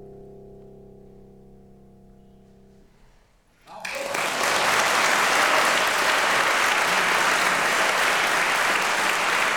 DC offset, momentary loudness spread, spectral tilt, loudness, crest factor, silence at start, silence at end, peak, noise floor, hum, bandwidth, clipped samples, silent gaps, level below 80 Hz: 0.1%; 5 LU; -0.5 dB/octave; -20 LUFS; 18 dB; 0 s; 0 s; -6 dBFS; -58 dBFS; none; 19 kHz; under 0.1%; none; -58 dBFS